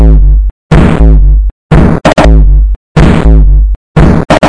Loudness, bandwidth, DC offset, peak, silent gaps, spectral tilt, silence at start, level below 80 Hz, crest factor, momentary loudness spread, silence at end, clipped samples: -7 LUFS; 9.4 kHz; under 0.1%; 0 dBFS; 0.51-0.69 s, 1.52-1.69 s, 2.76-2.95 s, 3.76-3.94 s; -7.5 dB/octave; 0 s; -6 dBFS; 4 dB; 5 LU; 0 s; 20%